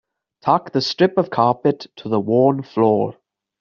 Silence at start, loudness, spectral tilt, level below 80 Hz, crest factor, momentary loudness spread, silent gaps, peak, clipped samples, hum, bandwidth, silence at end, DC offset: 0.45 s; -19 LUFS; -5 dB/octave; -62 dBFS; 18 dB; 7 LU; none; -2 dBFS; under 0.1%; none; 7.2 kHz; 0.5 s; under 0.1%